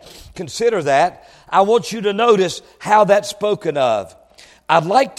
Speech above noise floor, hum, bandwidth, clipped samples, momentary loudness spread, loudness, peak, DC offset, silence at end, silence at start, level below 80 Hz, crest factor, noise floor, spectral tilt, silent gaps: 24 dB; none; 14.5 kHz; under 0.1%; 12 LU; -16 LUFS; 0 dBFS; under 0.1%; 0.1 s; 0.05 s; -54 dBFS; 16 dB; -40 dBFS; -4.5 dB/octave; none